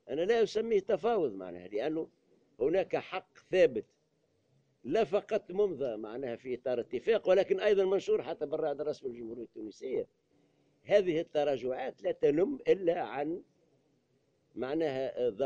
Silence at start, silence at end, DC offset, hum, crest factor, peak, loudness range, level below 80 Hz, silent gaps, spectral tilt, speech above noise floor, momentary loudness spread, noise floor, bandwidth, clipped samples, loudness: 0.05 s; 0 s; under 0.1%; none; 20 dB; -14 dBFS; 3 LU; -68 dBFS; none; -6 dB/octave; 43 dB; 14 LU; -74 dBFS; 7.6 kHz; under 0.1%; -32 LUFS